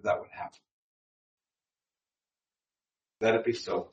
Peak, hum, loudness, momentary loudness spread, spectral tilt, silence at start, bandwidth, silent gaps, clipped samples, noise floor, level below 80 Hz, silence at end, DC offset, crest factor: -10 dBFS; none; -30 LUFS; 16 LU; -5 dB/octave; 0.05 s; 8.2 kHz; 0.71-1.38 s; under 0.1%; under -90 dBFS; -76 dBFS; 0.05 s; under 0.1%; 24 dB